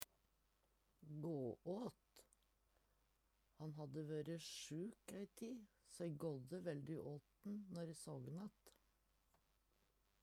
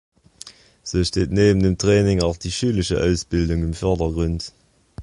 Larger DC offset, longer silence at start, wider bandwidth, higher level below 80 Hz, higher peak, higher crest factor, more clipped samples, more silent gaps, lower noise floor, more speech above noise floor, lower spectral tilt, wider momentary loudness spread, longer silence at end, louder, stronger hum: neither; second, 0 s vs 0.45 s; first, 16 kHz vs 11.5 kHz; second, -82 dBFS vs -32 dBFS; second, -20 dBFS vs -4 dBFS; first, 34 dB vs 16 dB; neither; neither; first, -82 dBFS vs -44 dBFS; first, 31 dB vs 25 dB; about the same, -6 dB/octave vs -6 dB/octave; second, 8 LU vs 19 LU; first, 1.5 s vs 0 s; second, -52 LUFS vs -20 LUFS; neither